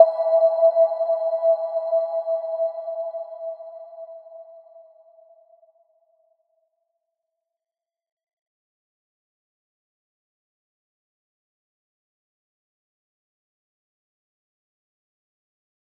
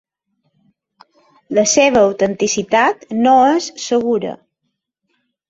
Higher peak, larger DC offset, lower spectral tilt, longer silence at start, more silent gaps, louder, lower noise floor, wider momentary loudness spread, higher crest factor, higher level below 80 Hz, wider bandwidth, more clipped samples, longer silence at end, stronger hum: about the same, -2 dBFS vs -2 dBFS; neither; about the same, -4 dB/octave vs -3 dB/octave; second, 0 s vs 1.5 s; neither; second, -22 LUFS vs -14 LUFS; first, -90 dBFS vs -74 dBFS; first, 23 LU vs 8 LU; first, 26 dB vs 16 dB; second, under -90 dBFS vs -56 dBFS; second, 4.4 kHz vs 8 kHz; neither; first, 11.15 s vs 1.15 s; neither